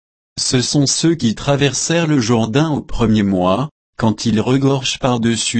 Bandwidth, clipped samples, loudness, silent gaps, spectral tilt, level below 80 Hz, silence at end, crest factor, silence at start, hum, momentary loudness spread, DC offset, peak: 8.8 kHz; under 0.1%; -16 LUFS; 3.71-3.93 s; -4.5 dB/octave; -38 dBFS; 0 s; 14 dB; 0.35 s; none; 5 LU; under 0.1%; -2 dBFS